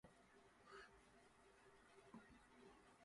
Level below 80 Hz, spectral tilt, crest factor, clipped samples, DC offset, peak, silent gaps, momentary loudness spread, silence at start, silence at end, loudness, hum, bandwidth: -82 dBFS; -4 dB/octave; 20 dB; under 0.1%; under 0.1%; -48 dBFS; none; 5 LU; 0.05 s; 0 s; -66 LUFS; none; 11 kHz